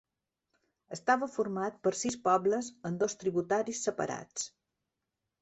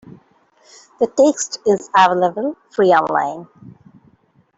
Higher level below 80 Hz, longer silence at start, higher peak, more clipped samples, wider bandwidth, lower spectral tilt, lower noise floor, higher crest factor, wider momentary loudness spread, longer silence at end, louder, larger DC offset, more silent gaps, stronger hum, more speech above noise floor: second, -74 dBFS vs -64 dBFS; first, 0.9 s vs 0.1 s; second, -14 dBFS vs -2 dBFS; neither; about the same, 8.2 kHz vs 8 kHz; about the same, -4 dB/octave vs -4 dB/octave; first, -87 dBFS vs -56 dBFS; about the same, 20 dB vs 16 dB; about the same, 10 LU vs 11 LU; about the same, 0.95 s vs 0.85 s; second, -32 LUFS vs -16 LUFS; neither; neither; neither; first, 55 dB vs 39 dB